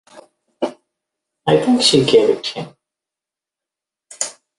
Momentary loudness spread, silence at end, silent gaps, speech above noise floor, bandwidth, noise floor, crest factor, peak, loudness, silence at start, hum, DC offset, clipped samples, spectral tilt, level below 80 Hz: 14 LU; 0.3 s; none; 73 dB; 11.5 kHz; -87 dBFS; 20 dB; 0 dBFS; -16 LUFS; 0.15 s; none; under 0.1%; under 0.1%; -4 dB/octave; -58 dBFS